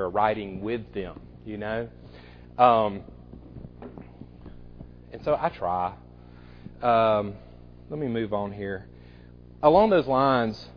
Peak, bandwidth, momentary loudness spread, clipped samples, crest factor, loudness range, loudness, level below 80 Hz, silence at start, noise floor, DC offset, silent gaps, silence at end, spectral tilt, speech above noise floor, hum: -4 dBFS; 5.4 kHz; 26 LU; under 0.1%; 22 dB; 7 LU; -25 LUFS; -50 dBFS; 0 s; -48 dBFS; under 0.1%; none; 0.05 s; -8.5 dB/octave; 23 dB; 60 Hz at -50 dBFS